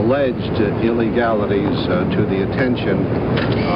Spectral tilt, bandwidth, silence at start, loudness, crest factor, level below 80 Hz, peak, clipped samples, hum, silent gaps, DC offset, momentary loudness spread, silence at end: -9.5 dB/octave; 5.6 kHz; 0 s; -18 LUFS; 12 dB; -36 dBFS; -4 dBFS; under 0.1%; none; none; under 0.1%; 2 LU; 0 s